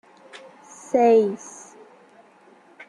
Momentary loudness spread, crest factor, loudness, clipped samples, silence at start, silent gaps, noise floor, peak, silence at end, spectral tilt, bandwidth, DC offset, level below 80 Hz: 27 LU; 18 dB; -19 LUFS; under 0.1%; 0.95 s; none; -53 dBFS; -8 dBFS; 1.4 s; -5.5 dB/octave; 10.5 kHz; under 0.1%; -72 dBFS